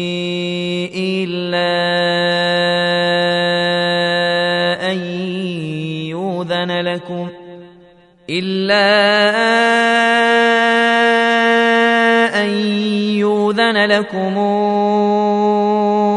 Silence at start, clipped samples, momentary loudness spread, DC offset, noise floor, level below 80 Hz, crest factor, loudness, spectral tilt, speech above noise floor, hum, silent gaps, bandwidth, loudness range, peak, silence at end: 0 s; under 0.1%; 10 LU; under 0.1%; -47 dBFS; -60 dBFS; 16 dB; -15 LUFS; -5 dB/octave; 31 dB; none; none; 11 kHz; 8 LU; 0 dBFS; 0 s